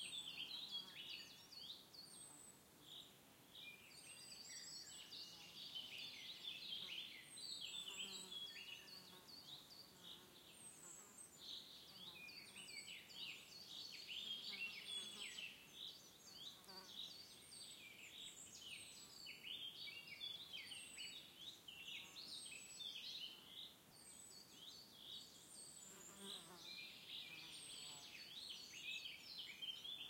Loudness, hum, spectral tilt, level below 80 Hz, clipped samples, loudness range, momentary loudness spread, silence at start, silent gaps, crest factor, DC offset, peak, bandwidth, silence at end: -53 LUFS; none; 0 dB/octave; -90 dBFS; under 0.1%; 6 LU; 10 LU; 0 s; none; 18 dB; under 0.1%; -38 dBFS; 16.5 kHz; 0 s